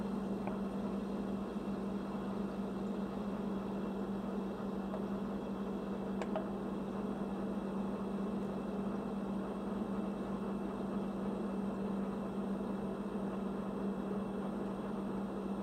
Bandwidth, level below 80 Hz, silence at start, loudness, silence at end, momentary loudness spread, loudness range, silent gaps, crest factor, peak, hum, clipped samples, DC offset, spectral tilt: 12.5 kHz; -60 dBFS; 0 s; -40 LUFS; 0 s; 1 LU; 1 LU; none; 16 dB; -24 dBFS; none; under 0.1%; under 0.1%; -8 dB/octave